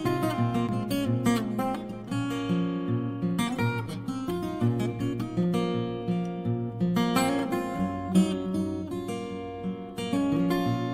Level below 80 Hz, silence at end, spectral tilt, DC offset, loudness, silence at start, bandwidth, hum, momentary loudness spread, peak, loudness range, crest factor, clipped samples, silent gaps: -54 dBFS; 0 s; -6.5 dB/octave; under 0.1%; -29 LUFS; 0 s; 16 kHz; none; 8 LU; -10 dBFS; 2 LU; 18 dB; under 0.1%; none